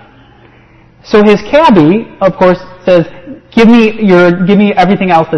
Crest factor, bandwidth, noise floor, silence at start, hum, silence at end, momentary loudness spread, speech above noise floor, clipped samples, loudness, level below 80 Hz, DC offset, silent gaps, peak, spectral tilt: 8 dB; 7.6 kHz; -41 dBFS; 1.1 s; none; 0 s; 6 LU; 34 dB; 2%; -7 LUFS; -38 dBFS; under 0.1%; none; 0 dBFS; -7.5 dB/octave